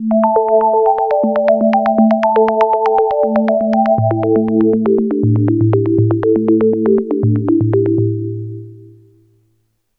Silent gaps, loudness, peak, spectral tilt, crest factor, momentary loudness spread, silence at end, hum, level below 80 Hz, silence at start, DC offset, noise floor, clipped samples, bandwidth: none; -13 LUFS; 0 dBFS; -11 dB/octave; 14 dB; 3 LU; 1.15 s; none; -50 dBFS; 0 s; under 0.1%; -62 dBFS; under 0.1%; 5.2 kHz